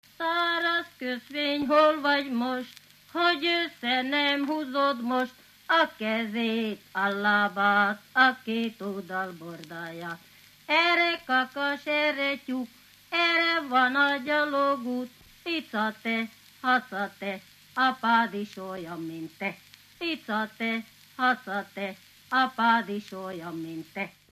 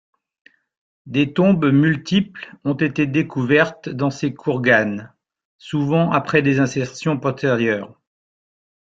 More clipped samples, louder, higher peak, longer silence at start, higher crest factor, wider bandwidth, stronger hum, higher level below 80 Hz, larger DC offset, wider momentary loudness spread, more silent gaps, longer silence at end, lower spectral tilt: neither; second, -27 LUFS vs -19 LUFS; second, -8 dBFS vs -2 dBFS; second, 0.2 s vs 1.05 s; about the same, 20 dB vs 18 dB; first, 15 kHz vs 7.8 kHz; first, 50 Hz at -65 dBFS vs none; second, -74 dBFS vs -56 dBFS; neither; first, 15 LU vs 9 LU; second, none vs 5.45-5.59 s; second, 0.2 s vs 0.95 s; second, -4.5 dB/octave vs -6.5 dB/octave